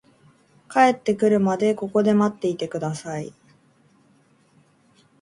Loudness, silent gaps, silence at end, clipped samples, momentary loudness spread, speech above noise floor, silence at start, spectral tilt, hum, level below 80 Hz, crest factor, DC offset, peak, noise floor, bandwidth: -22 LUFS; none; 1.9 s; under 0.1%; 12 LU; 38 dB; 0.7 s; -6.5 dB/octave; none; -66 dBFS; 18 dB; under 0.1%; -4 dBFS; -59 dBFS; 11.5 kHz